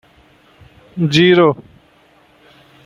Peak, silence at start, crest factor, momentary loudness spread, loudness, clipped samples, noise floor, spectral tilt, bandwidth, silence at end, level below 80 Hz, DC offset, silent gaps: -2 dBFS; 0.95 s; 16 dB; 19 LU; -12 LUFS; under 0.1%; -51 dBFS; -6 dB/octave; 10 kHz; 1.25 s; -56 dBFS; under 0.1%; none